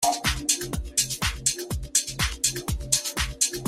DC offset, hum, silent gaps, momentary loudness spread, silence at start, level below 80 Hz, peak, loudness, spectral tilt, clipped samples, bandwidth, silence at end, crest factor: under 0.1%; none; none; 4 LU; 0 s; -36 dBFS; -4 dBFS; -25 LUFS; -1.5 dB/octave; under 0.1%; 16 kHz; 0 s; 22 dB